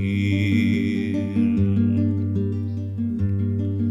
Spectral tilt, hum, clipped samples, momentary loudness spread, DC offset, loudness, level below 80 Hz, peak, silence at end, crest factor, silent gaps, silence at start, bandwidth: -8.5 dB/octave; none; under 0.1%; 6 LU; under 0.1%; -22 LUFS; -48 dBFS; -8 dBFS; 0 s; 12 dB; none; 0 s; 7.4 kHz